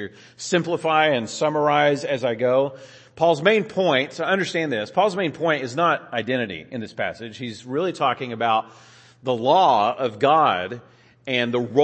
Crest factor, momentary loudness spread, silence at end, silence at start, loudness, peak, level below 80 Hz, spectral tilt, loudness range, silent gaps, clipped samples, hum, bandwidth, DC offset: 18 dB; 14 LU; 0 s; 0 s; -21 LUFS; -4 dBFS; -68 dBFS; -5 dB/octave; 4 LU; none; under 0.1%; none; 8.8 kHz; under 0.1%